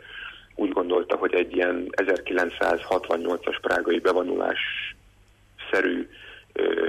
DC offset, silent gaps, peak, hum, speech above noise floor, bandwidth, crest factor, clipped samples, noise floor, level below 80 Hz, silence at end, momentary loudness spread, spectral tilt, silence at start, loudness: under 0.1%; none; -10 dBFS; none; 32 dB; 13.5 kHz; 14 dB; under 0.1%; -57 dBFS; -58 dBFS; 0 s; 12 LU; -4.5 dB/octave; 0 s; -25 LUFS